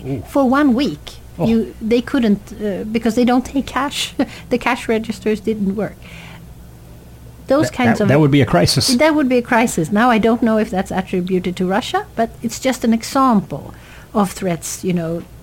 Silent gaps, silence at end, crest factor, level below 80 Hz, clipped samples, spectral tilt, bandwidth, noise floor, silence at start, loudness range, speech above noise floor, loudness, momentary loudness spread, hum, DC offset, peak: none; 0 s; 16 dB; -40 dBFS; under 0.1%; -5.5 dB/octave; 17 kHz; -38 dBFS; 0 s; 7 LU; 22 dB; -17 LUFS; 10 LU; none; under 0.1%; -2 dBFS